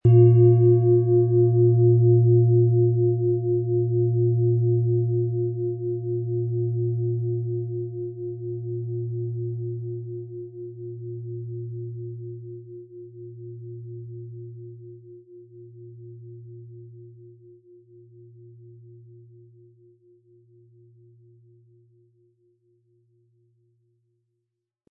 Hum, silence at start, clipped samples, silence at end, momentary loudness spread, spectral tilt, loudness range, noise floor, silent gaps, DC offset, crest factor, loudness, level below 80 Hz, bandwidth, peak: none; 0.05 s; under 0.1%; 7.6 s; 25 LU; -15.5 dB/octave; 25 LU; -82 dBFS; none; under 0.1%; 18 dB; -22 LUFS; -64 dBFS; 1.2 kHz; -6 dBFS